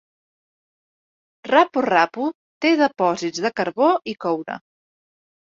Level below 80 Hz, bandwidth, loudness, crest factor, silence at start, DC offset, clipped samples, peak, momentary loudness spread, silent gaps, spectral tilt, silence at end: -68 dBFS; 7.6 kHz; -20 LUFS; 20 dB; 1.45 s; under 0.1%; under 0.1%; -2 dBFS; 10 LU; 2.35-2.61 s; -4.5 dB/octave; 1 s